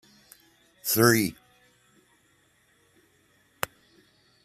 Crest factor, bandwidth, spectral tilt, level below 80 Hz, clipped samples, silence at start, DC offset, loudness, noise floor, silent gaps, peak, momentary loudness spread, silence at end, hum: 30 dB; 14.5 kHz; -4 dB/octave; -66 dBFS; under 0.1%; 0.85 s; under 0.1%; -25 LUFS; -65 dBFS; none; -2 dBFS; 15 LU; 3.15 s; none